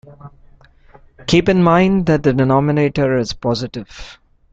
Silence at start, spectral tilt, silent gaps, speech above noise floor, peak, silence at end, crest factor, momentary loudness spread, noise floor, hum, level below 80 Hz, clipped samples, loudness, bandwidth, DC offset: 0.05 s; -7 dB/octave; none; 31 dB; 0 dBFS; 0.4 s; 16 dB; 17 LU; -46 dBFS; none; -40 dBFS; under 0.1%; -15 LUFS; 7.8 kHz; under 0.1%